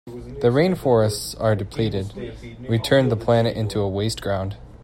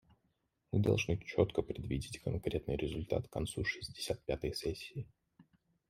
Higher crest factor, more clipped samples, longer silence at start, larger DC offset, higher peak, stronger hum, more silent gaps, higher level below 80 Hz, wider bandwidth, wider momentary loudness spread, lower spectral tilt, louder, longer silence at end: second, 18 dB vs 24 dB; neither; second, 0.05 s vs 0.7 s; neither; first, -4 dBFS vs -14 dBFS; neither; neither; first, -44 dBFS vs -54 dBFS; about the same, 16 kHz vs 15 kHz; first, 14 LU vs 8 LU; about the same, -6 dB/octave vs -6 dB/octave; first, -21 LUFS vs -37 LUFS; second, 0 s vs 0.45 s